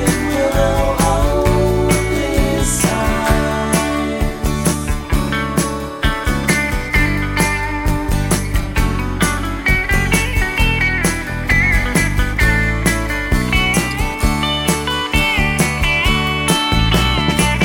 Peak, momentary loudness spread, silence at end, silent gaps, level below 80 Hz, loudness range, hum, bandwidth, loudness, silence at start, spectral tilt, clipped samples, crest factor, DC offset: 0 dBFS; 5 LU; 0 s; none; -22 dBFS; 3 LU; none; 17 kHz; -16 LUFS; 0 s; -4.5 dB/octave; under 0.1%; 14 dB; under 0.1%